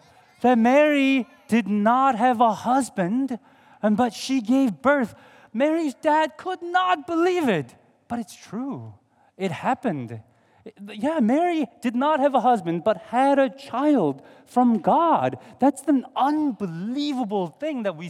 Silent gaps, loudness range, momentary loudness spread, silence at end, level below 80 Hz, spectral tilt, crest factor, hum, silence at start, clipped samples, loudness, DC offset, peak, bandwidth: none; 6 LU; 13 LU; 0 s; -72 dBFS; -6 dB/octave; 18 dB; none; 0.4 s; under 0.1%; -22 LUFS; under 0.1%; -6 dBFS; 13.5 kHz